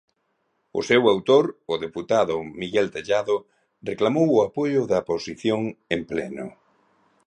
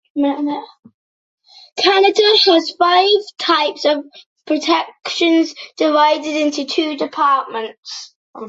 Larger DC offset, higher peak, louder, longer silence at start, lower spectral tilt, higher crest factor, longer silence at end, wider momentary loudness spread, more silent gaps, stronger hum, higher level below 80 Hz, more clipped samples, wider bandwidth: neither; second, -6 dBFS vs -2 dBFS; second, -23 LUFS vs -15 LUFS; first, 0.75 s vs 0.15 s; first, -5.5 dB/octave vs -2 dB/octave; about the same, 18 dB vs 16 dB; first, 0.75 s vs 0 s; about the same, 12 LU vs 14 LU; second, none vs 0.79-0.83 s, 0.94-1.38 s, 4.26-4.36 s, 7.78-7.83 s, 8.16-8.34 s; neither; first, -60 dBFS vs -68 dBFS; neither; first, 9.8 kHz vs 8 kHz